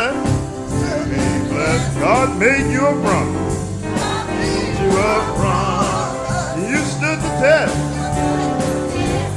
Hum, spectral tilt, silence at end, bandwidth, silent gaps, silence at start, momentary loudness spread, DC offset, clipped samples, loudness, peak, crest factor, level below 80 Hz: none; -5.5 dB/octave; 0 s; 12 kHz; none; 0 s; 7 LU; under 0.1%; under 0.1%; -18 LUFS; -2 dBFS; 16 dB; -34 dBFS